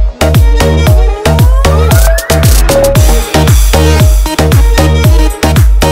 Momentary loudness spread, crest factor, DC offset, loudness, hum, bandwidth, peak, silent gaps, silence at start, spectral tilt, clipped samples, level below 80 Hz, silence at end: 2 LU; 6 dB; under 0.1%; -7 LUFS; none; 16.5 kHz; 0 dBFS; none; 0 s; -5 dB/octave; 0.3%; -8 dBFS; 0 s